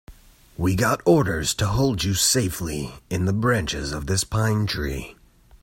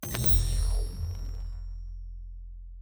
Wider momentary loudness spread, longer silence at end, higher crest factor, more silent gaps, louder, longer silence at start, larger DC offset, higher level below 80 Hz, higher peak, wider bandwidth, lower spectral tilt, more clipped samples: second, 11 LU vs 23 LU; first, 0.5 s vs 0 s; about the same, 18 dB vs 20 dB; neither; first, -22 LUFS vs -29 LUFS; about the same, 0.1 s vs 0 s; neither; second, -40 dBFS vs -32 dBFS; first, -4 dBFS vs -10 dBFS; second, 16.5 kHz vs over 20 kHz; about the same, -4.5 dB/octave vs -4.5 dB/octave; neither